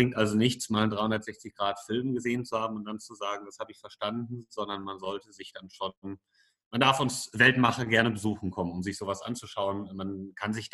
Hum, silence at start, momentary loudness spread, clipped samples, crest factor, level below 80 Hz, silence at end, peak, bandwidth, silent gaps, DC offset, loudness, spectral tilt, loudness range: none; 0 s; 16 LU; under 0.1%; 24 dB; -64 dBFS; 0.05 s; -6 dBFS; 12.5 kHz; 5.97-6.02 s, 6.66-6.71 s; under 0.1%; -29 LUFS; -4.5 dB/octave; 10 LU